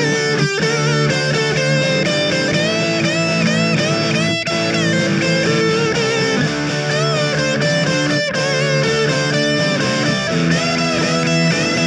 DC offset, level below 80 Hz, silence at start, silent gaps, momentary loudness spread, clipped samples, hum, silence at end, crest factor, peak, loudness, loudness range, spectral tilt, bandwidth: under 0.1%; -48 dBFS; 0 s; none; 2 LU; under 0.1%; none; 0 s; 12 dB; -4 dBFS; -16 LUFS; 1 LU; -4.5 dB/octave; 11 kHz